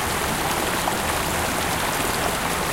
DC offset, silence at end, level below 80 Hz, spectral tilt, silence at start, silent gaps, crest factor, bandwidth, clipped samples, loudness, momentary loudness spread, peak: under 0.1%; 0 s; -38 dBFS; -3 dB/octave; 0 s; none; 16 dB; 17 kHz; under 0.1%; -22 LUFS; 1 LU; -8 dBFS